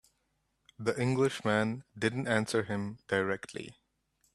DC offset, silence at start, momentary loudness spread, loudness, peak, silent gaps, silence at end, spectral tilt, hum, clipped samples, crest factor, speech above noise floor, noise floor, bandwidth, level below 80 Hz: under 0.1%; 0.8 s; 9 LU; -32 LUFS; -12 dBFS; none; 0.65 s; -5.5 dB/octave; none; under 0.1%; 22 dB; 46 dB; -78 dBFS; 13 kHz; -68 dBFS